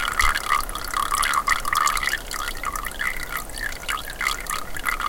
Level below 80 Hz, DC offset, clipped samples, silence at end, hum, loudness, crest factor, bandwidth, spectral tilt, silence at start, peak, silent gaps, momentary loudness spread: -34 dBFS; 0.2%; under 0.1%; 0 s; none; -24 LUFS; 20 dB; 17 kHz; -0.5 dB/octave; 0 s; -4 dBFS; none; 8 LU